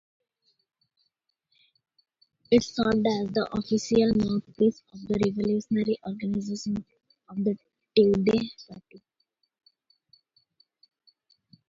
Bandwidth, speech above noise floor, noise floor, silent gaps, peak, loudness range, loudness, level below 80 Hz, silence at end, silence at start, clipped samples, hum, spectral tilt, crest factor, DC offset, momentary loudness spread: 7.6 kHz; 52 dB; -78 dBFS; none; -8 dBFS; 4 LU; -26 LUFS; -58 dBFS; 2.7 s; 2.5 s; under 0.1%; none; -6.5 dB/octave; 20 dB; under 0.1%; 12 LU